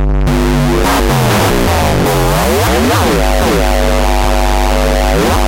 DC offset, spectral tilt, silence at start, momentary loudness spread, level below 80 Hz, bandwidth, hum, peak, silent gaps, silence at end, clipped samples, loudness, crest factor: under 0.1%; -5 dB/octave; 0 s; 2 LU; -14 dBFS; 17 kHz; none; -2 dBFS; none; 0 s; under 0.1%; -11 LUFS; 8 dB